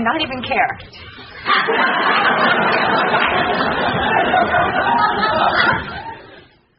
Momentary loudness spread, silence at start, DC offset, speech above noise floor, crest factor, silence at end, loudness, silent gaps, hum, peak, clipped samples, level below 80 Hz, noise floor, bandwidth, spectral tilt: 14 LU; 0 s; under 0.1%; 28 dB; 16 dB; 0.4 s; -15 LUFS; none; none; 0 dBFS; under 0.1%; -46 dBFS; -45 dBFS; 5.8 kHz; -1.5 dB/octave